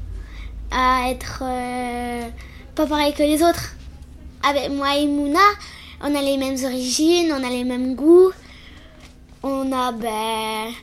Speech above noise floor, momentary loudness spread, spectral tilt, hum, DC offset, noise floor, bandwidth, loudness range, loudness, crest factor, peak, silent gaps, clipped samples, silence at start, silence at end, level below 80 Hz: 25 dB; 17 LU; -4 dB/octave; none; under 0.1%; -44 dBFS; 15.5 kHz; 4 LU; -20 LUFS; 18 dB; -4 dBFS; none; under 0.1%; 0 s; 0 s; -40 dBFS